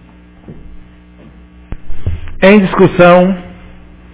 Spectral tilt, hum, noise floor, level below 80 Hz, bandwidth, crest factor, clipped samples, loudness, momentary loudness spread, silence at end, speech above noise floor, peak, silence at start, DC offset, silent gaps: -11 dB/octave; 60 Hz at -35 dBFS; -38 dBFS; -30 dBFS; 4 kHz; 12 dB; 0.9%; -8 LUFS; 17 LU; 0.6 s; 31 dB; 0 dBFS; 0.5 s; under 0.1%; none